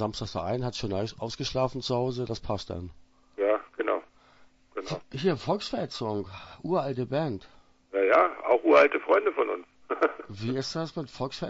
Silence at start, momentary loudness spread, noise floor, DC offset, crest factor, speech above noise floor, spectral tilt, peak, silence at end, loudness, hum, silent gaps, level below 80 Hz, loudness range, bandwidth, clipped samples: 0 s; 14 LU; -59 dBFS; under 0.1%; 22 dB; 31 dB; -6 dB/octave; -6 dBFS; 0 s; -28 LUFS; none; none; -54 dBFS; 7 LU; 8 kHz; under 0.1%